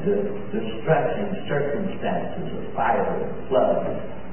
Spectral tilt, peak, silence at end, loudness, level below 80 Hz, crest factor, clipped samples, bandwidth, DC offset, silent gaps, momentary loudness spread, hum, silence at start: -11.5 dB/octave; -6 dBFS; 0 s; -25 LUFS; -50 dBFS; 18 dB; under 0.1%; 3.2 kHz; 3%; none; 8 LU; none; 0 s